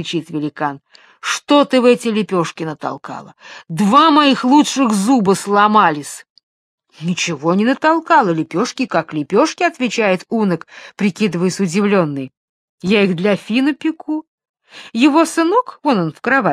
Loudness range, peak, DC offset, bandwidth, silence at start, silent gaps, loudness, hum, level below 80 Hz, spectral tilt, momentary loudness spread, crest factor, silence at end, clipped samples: 4 LU; 0 dBFS; under 0.1%; 14 kHz; 0 s; 6.30-6.36 s, 6.43-6.78 s, 12.37-12.78 s, 14.27-14.38 s, 14.49-14.54 s; -15 LUFS; none; -64 dBFS; -5 dB/octave; 14 LU; 16 dB; 0 s; under 0.1%